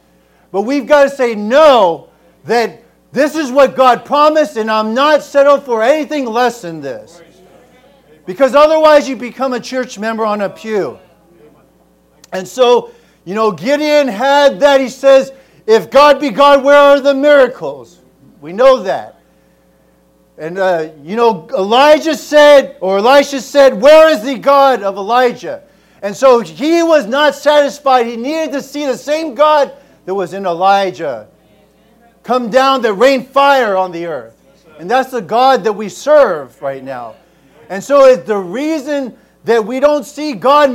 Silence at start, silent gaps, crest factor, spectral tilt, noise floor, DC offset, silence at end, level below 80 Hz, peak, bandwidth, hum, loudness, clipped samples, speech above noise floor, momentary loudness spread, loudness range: 0.55 s; none; 12 dB; -4 dB/octave; -51 dBFS; under 0.1%; 0 s; -54 dBFS; 0 dBFS; 16 kHz; none; -11 LUFS; 1%; 40 dB; 16 LU; 7 LU